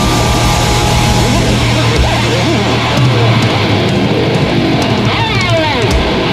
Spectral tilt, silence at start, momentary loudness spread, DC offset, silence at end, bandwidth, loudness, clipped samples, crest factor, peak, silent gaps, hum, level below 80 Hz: -5 dB/octave; 0 s; 2 LU; under 0.1%; 0 s; 15.5 kHz; -11 LUFS; under 0.1%; 10 dB; 0 dBFS; none; none; -22 dBFS